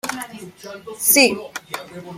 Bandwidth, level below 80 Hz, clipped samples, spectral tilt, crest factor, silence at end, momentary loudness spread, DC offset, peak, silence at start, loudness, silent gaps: 16.5 kHz; -64 dBFS; under 0.1%; -1.5 dB/octave; 20 dB; 0 s; 23 LU; under 0.1%; 0 dBFS; 0.05 s; -15 LUFS; none